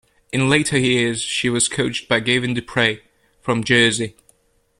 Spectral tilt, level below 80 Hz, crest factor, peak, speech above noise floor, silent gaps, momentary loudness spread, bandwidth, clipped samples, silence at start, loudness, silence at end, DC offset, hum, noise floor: -3.5 dB/octave; -52 dBFS; 18 dB; -2 dBFS; 40 dB; none; 10 LU; 12.5 kHz; under 0.1%; 0.35 s; -18 LUFS; 0.7 s; under 0.1%; none; -59 dBFS